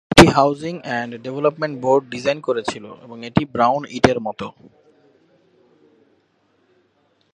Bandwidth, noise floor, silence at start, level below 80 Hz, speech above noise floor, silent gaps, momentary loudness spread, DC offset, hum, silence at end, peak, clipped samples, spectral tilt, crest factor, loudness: 13 kHz; -63 dBFS; 0.1 s; -42 dBFS; 43 dB; none; 18 LU; under 0.1%; none; 2.85 s; 0 dBFS; 0.1%; -5 dB/octave; 20 dB; -19 LUFS